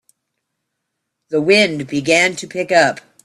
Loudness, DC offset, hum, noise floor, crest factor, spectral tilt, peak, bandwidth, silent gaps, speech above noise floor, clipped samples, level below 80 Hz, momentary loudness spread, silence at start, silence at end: -15 LUFS; under 0.1%; none; -76 dBFS; 18 dB; -3.5 dB/octave; 0 dBFS; 13.5 kHz; none; 61 dB; under 0.1%; -62 dBFS; 9 LU; 1.3 s; 0.25 s